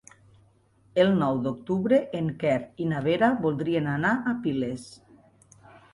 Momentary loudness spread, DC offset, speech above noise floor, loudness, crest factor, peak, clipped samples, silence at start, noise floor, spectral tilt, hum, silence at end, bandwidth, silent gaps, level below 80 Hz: 8 LU; under 0.1%; 36 dB; -26 LUFS; 18 dB; -8 dBFS; under 0.1%; 0.95 s; -61 dBFS; -7.5 dB/octave; none; 1 s; 11.5 kHz; none; -62 dBFS